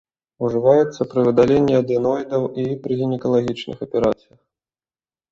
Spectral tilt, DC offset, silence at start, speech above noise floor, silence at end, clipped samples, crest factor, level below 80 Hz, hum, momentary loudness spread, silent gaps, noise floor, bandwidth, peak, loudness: -8 dB/octave; under 0.1%; 0.4 s; over 72 dB; 1.2 s; under 0.1%; 18 dB; -52 dBFS; none; 10 LU; none; under -90 dBFS; 7.6 kHz; -2 dBFS; -19 LUFS